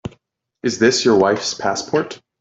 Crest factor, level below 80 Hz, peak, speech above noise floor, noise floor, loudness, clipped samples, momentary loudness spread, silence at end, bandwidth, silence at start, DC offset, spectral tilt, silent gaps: 16 dB; -54 dBFS; -2 dBFS; 44 dB; -61 dBFS; -17 LUFS; under 0.1%; 12 LU; 0.25 s; 8 kHz; 0.05 s; under 0.1%; -3.5 dB/octave; none